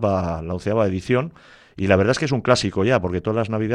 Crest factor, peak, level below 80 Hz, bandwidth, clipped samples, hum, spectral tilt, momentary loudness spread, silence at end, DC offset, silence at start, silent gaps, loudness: 18 dB; -2 dBFS; -46 dBFS; 11 kHz; under 0.1%; none; -6 dB/octave; 8 LU; 0 s; under 0.1%; 0 s; none; -21 LUFS